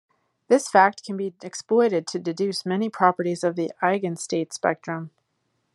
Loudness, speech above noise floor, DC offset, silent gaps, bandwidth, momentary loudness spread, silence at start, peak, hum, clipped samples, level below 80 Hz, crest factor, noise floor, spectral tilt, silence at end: -23 LUFS; 50 dB; under 0.1%; none; 12.5 kHz; 12 LU; 0.5 s; -2 dBFS; none; under 0.1%; -76 dBFS; 22 dB; -73 dBFS; -5 dB/octave; 0.65 s